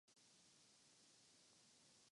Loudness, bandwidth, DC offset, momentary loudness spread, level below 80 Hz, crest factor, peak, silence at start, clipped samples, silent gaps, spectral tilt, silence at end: -70 LUFS; 11 kHz; under 0.1%; 0 LU; under -90 dBFS; 14 dB; -58 dBFS; 0.05 s; under 0.1%; none; -1 dB/octave; 0 s